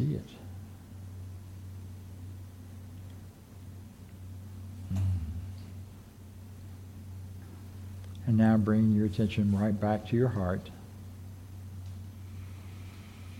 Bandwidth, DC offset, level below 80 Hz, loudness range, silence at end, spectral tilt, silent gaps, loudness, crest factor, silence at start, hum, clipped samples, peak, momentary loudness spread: 16 kHz; under 0.1%; -54 dBFS; 18 LU; 0 s; -8.5 dB/octave; none; -29 LUFS; 20 dB; 0 s; none; under 0.1%; -14 dBFS; 21 LU